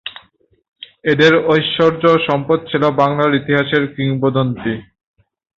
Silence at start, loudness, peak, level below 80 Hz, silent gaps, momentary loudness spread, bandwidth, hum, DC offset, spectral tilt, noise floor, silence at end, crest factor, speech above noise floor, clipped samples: 0.05 s; -15 LUFS; -2 dBFS; -52 dBFS; 0.68-0.72 s; 11 LU; 7.4 kHz; none; under 0.1%; -7 dB/octave; -54 dBFS; 0.75 s; 14 dB; 39 dB; under 0.1%